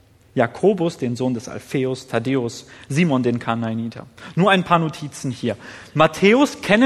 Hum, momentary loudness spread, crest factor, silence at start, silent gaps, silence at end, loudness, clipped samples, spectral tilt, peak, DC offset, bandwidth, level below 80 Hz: none; 13 LU; 20 dB; 0.35 s; none; 0 s; -20 LUFS; under 0.1%; -6 dB/octave; 0 dBFS; under 0.1%; 13.5 kHz; -58 dBFS